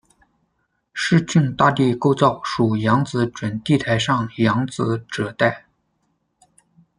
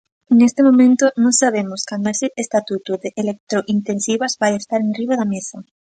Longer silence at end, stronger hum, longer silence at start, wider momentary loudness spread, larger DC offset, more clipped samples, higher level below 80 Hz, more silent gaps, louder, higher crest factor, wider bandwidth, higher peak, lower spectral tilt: first, 1.4 s vs 0.25 s; neither; first, 0.95 s vs 0.3 s; second, 8 LU vs 12 LU; neither; neither; first, -54 dBFS vs -66 dBFS; second, none vs 3.40-3.47 s; about the same, -19 LUFS vs -17 LUFS; about the same, 18 dB vs 14 dB; about the same, 10.5 kHz vs 9.6 kHz; about the same, -2 dBFS vs -2 dBFS; first, -6 dB/octave vs -4 dB/octave